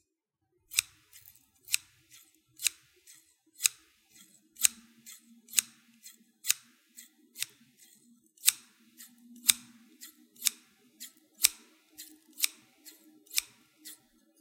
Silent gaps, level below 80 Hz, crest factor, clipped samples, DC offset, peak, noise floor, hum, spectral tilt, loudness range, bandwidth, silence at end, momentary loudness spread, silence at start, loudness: none; -78 dBFS; 38 dB; under 0.1%; under 0.1%; 0 dBFS; -83 dBFS; none; 3.5 dB/octave; 4 LU; 17 kHz; 0.45 s; 25 LU; 0.75 s; -30 LUFS